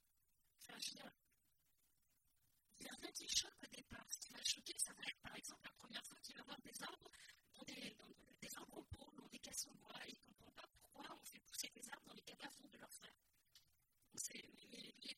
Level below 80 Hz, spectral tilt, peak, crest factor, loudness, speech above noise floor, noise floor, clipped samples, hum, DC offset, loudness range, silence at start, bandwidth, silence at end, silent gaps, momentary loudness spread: -80 dBFS; -0.5 dB/octave; -24 dBFS; 32 dB; -51 LUFS; 29 dB; -84 dBFS; under 0.1%; none; under 0.1%; 9 LU; 0.6 s; 16.5 kHz; 0.05 s; none; 19 LU